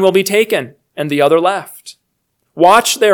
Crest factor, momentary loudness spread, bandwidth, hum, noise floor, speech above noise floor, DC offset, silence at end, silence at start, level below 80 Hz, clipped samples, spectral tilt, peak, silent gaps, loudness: 14 dB; 19 LU; 19.5 kHz; none; -68 dBFS; 56 dB; under 0.1%; 0 s; 0 s; -60 dBFS; 0.4%; -3.5 dB/octave; 0 dBFS; none; -13 LUFS